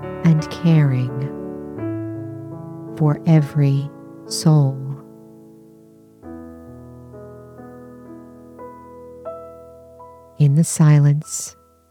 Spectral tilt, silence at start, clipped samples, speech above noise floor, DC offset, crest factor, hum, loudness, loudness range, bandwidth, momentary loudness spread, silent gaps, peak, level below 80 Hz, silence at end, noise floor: -7 dB/octave; 0 s; under 0.1%; 32 dB; under 0.1%; 16 dB; none; -18 LUFS; 20 LU; 13.5 kHz; 24 LU; none; -4 dBFS; -56 dBFS; 0.4 s; -48 dBFS